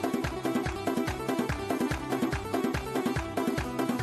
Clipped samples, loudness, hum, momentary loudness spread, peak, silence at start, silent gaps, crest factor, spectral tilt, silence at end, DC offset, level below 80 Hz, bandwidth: under 0.1%; -31 LUFS; none; 1 LU; -14 dBFS; 0 s; none; 16 dB; -5.5 dB/octave; 0 s; under 0.1%; -44 dBFS; 14 kHz